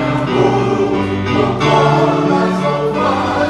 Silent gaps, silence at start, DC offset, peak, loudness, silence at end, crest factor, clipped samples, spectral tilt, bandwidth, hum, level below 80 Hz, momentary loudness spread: none; 0 s; under 0.1%; 0 dBFS; -14 LUFS; 0 s; 14 dB; under 0.1%; -6.5 dB/octave; 12 kHz; none; -40 dBFS; 4 LU